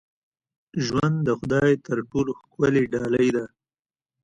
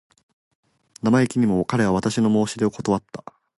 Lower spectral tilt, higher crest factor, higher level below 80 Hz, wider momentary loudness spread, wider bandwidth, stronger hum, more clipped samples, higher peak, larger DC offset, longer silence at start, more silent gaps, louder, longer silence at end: about the same, -7 dB/octave vs -6.5 dB/octave; about the same, 16 dB vs 16 dB; about the same, -54 dBFS vs -52 dBFS; about the same, 8 LU vs 7 LU; second, 10 kHz vs 11.5 kHz; neither; neither; about the same, -8 dBFS vs -6 dBFS; neither; second, 0.75 s vs 1.05 s; neither; about the same, -23 LUFS vs -21 LUFS; first, 0.75 s vs 0.4 s